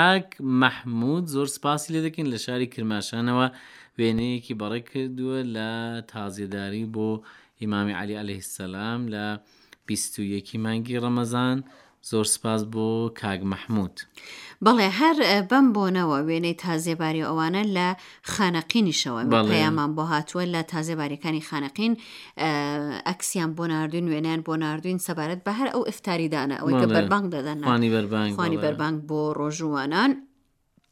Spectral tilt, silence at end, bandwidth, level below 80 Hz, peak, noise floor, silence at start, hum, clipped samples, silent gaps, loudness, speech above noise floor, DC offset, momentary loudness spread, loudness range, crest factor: -5 dB/octave; 0.65 s; 16 kHz; -64 dBFS; -2 dBFS; -66 dBFS; 0 s; none; under 0.1%; none; -25 LUFS; 41 dB; under 0.1%; 11 LU; 8 LU; 24 dB